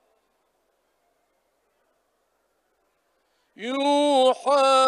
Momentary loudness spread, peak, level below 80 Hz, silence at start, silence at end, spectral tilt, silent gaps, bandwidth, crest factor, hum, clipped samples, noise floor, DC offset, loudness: 12 LU; -8 dBFS; -84 dBFS; 3.6 s; 0 s; -1.5 dB/octave; none; 11 kHz; 18 dB; none; under 0.1%; -71 dBFS; under 0.1%; -21 LUFS